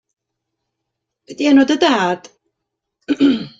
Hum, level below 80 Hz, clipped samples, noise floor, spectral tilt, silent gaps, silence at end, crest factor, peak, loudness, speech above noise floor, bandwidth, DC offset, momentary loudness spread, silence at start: none; -60 dBFS; under 0.1%; -78 dBFS; -4.5 dB/octave; none; 0.1 s; 18 dB; 0 dBFS; -15 LUFS; 64 dB; 7.6 kHz; under 0.1%; 10 LU; 1.3 s